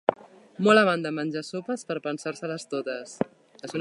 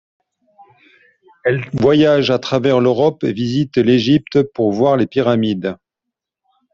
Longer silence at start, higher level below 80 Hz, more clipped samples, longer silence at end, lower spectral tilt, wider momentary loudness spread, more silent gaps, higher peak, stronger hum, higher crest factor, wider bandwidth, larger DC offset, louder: second, 0.1 s vs 1.45 s; second, -76 dBFS vs -52 dBFS; neither; second, 0 s vs 1 s; second, -5 dB/octave vs -7 dB/octave; first, 15 LU vs 7 LU; neither; about the same, -2 dBFS vs -2 dBFS; neither; first, 24 dB vs 14 dB; first, 11.5 kHz vs 7.4 kHz; neither; second, -27 LUFS vs -15 LUFS